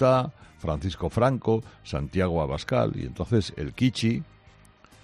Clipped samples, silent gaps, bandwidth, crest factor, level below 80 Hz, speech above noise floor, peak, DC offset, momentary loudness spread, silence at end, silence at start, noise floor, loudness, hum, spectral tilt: under 0.1%; none; 12 kHz; 18 dB; -46 dBFS; 29 dB; -8 dBFS; under 0.1%; 9 LU; 0.8 s; 0 s; -54 dBFS; -27 LUFS; none; -7 dB/octave